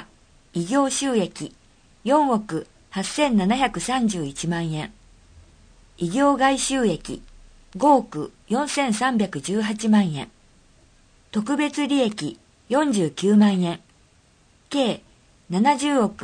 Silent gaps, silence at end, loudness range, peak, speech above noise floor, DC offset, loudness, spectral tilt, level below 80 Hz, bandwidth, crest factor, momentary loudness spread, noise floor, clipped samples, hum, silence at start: none; 0 s; 2 LU; -4 dBFS; 36 dB; under 0.1%; -22 LUFS; -5 dB/octave; -52 dBFS; 9.8 kHz; 18 dB; 14 LU; -57 dBFS; under 0.1%; none; 0 s